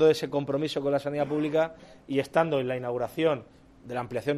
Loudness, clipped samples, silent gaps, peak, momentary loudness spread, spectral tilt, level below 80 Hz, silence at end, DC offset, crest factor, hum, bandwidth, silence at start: -28 LUFS; under 0.1%; none; -10 dBFS; 7 LU; -6.5 dB/octave; -62 dBFS; 0 s; under 0.1%; 18 dB; none; 13.5 kHz; 0 s